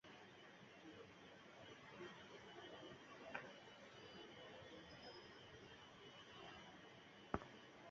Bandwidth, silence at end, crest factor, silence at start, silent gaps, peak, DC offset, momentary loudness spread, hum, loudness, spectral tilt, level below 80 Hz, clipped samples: 7.4 kHz; 0 s; 34 dB; 0.05 s; none; -24 dBFS; under 0.1%; 8 LU; none; -58 LUFS; -2.5 dB/octave; -76 dBFS; under 0.1%